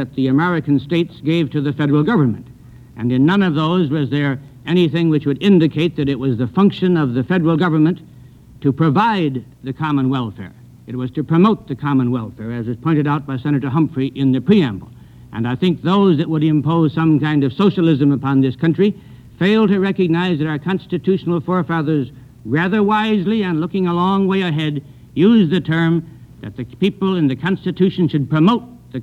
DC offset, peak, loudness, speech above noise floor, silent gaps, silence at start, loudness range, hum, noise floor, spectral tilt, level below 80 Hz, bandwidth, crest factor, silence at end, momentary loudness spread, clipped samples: under 0.1%; -2 dBFS; -17 LUFS; 26 dB; none; 0 s; 3 LU; none; -41 dBFS; -9 dB/octave; -50 dBFS; 7.6 kHz; 14 dB; 0 s; 10 LU; under 0.1%